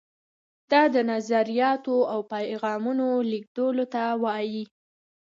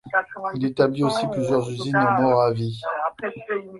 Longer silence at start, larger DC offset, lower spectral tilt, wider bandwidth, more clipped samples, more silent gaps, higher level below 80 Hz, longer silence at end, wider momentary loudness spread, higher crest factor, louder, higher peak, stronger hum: first, 0.7 s vs 0.05 s; neither; about the same, -5.5 dB/octave vs -6.5 dB/octave; second, 7.6 kHz vs 11.5 kHz; neither; first, 3.47-3.55 s vs none; second, -80 dBFS vs -60 dBFS; first, 0.65 s vs 0 s; about the same, 9 LU vs 9 LU; about the same, 18 dB vs 18 dB; about the same, -25 LUFS vs -23 LUFS; second, -8 dBFS vs -4 dBFS; neither